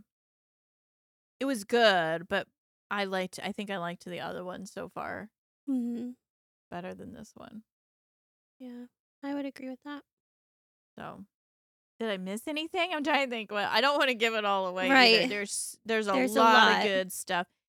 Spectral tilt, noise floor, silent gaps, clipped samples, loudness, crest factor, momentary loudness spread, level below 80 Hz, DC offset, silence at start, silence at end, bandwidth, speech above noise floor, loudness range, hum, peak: -3 dB/octave; under -90 dBFS; 2.58-2.90 s, 5.38-5.67 s, 6.30-6.71 s, 7.72-8.60 s, 8.99-9.22 s, 10.12-10.97 s, 11.34-11.99 s; under 0.1%; -28 LUFS; 24 dB; 24 LU; -76 dBFS; under 0.1%; 1.4 s; 0.25 s; 17.5 kHz; over 61 dB; 19 LU; none; -6 dBFS